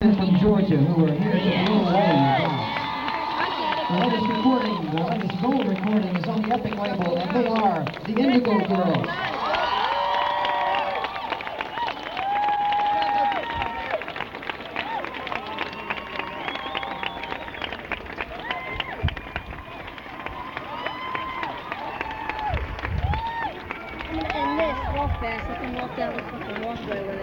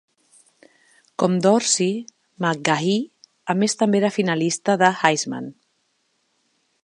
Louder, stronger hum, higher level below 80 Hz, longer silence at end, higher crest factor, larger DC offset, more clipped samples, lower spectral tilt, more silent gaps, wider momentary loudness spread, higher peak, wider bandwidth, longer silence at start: second, -25 LUFS vs -20 LUFS; neither; first, -42 dBFS vs -74 dBFS; second, 0 s vs 1.35 s; second, 16 dB vs 22 dB; neither; neither; first, -7.5 dB/octave vs -4 dB/octave; neither; second, 12 LU vs 15 LU; second, -8 dBFS vs 0 dBFS; first, 16.5 kHz vs 11 kHz; second, 0 s vs 1.2 s